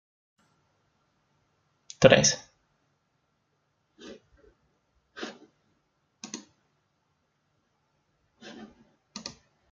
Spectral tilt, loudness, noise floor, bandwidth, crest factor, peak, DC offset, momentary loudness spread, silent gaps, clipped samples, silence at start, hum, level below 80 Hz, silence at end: -3.5 dB/octave; -21 LUFS; -75 dBFS; 7.6 kHz; 32 dB; -2 dBFS; under 0.1%; 30 LU; none; under 0.1%; 2 s; none; -62 dBFS; 0.45 s